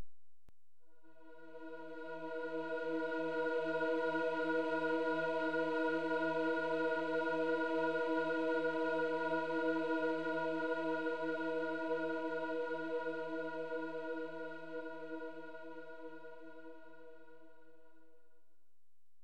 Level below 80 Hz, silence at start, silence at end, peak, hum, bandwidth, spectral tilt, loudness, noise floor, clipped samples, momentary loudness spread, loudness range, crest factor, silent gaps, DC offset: -88 dBFS; 0 s; 1.75 s; -24 dBFS; none; 9.2 kHz; -6 dB/octave; -38 LUFS; under -90 dBFS; under 0.1%; 15 LU; 14 LU; 14 dB; none; 0.3%